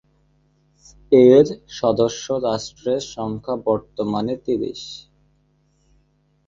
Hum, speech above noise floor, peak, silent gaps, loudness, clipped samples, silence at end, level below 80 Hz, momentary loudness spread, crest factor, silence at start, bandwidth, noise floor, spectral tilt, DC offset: none; 43 dB; -2 dBFS; none; -19 LUFS; under 0.1%; 1.45 s; -54 dBFS; 15 LU; 20 dB; 1.1 s; 7.6 kHz; -62 dBFS; -6 dB/octave; under 0.1%